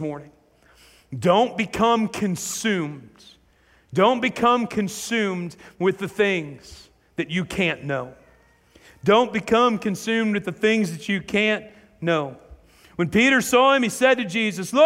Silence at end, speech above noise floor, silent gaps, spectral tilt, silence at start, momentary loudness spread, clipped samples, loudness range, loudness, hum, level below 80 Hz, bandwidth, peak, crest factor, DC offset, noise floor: 0 s; 37 dB; none; -4.5 dB/octave; 0 s; 13 LU; under 0.1%; 5 LU; -21 LUFS; none; -56 dBFS; 16 kHz; -4 dBFS; 18 dB; under 0.1%; -58 dBFS